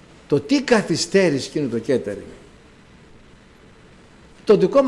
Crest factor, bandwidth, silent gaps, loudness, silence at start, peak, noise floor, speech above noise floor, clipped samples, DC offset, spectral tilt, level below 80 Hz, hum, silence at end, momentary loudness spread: 16 dB; 12 kHz; none; -20 LUFS; 0.3 s; -6 dBFS; -48 dBFS; 30 dB; under 0.1%; under 0.1%; -5 dB/octave; -54 dBFS; none; 0 s; 14 LU